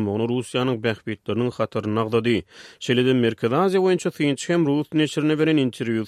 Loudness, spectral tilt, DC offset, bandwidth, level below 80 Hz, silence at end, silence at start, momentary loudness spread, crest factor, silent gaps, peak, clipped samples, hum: -22 LUFS; -6 dB/octave; under 0.1%; 14 kHz; -60 dBFS; 0 s; 0 s; 6 LU; 16 dB; none; -6 dBFS; under 0.1%; none